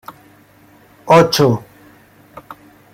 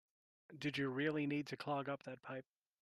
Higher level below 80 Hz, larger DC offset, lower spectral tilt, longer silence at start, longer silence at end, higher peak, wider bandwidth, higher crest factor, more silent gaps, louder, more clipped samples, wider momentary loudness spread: first, -54 dBFS vs -84 dBFS; neither; about the same, -5.5 dB/octave vs -6.5 dB/octave; first, 1.05 s vs 0.5 s; about the same, 0.4 s vs 0.4 s; first, 0 dBFS vs -26 dBFS; first, 16.5 kHz vs 12.5 kHz; about the same, 18 dB vs 18 dB; neither; first, -13 LUFS vs -42 LUFS; neither; first, 27 LU vs 12 LU